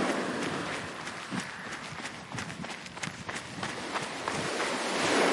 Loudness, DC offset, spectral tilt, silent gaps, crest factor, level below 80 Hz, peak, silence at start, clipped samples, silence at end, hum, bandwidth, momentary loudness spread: -34 LUFS; under 0.1%; -3 dB/octave; none; 20 dB; -66 dBFS; -14 dBFS; 0 s; under 0.1%; 0 s; none; 11.5 kHz; 9 LU